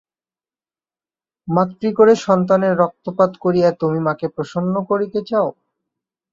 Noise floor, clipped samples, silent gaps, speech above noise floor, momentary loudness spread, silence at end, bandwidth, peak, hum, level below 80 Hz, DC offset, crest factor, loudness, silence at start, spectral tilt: under -90 dBFS; under 0.1%; none; over 73 dB; 9 LU; 0.8 s; 7.6 kHz; -2 dBFS; none; -60 dBFS; under 0.1%; 16 dB; -18 LUFS; 1.45 s; -7.5 dB/octave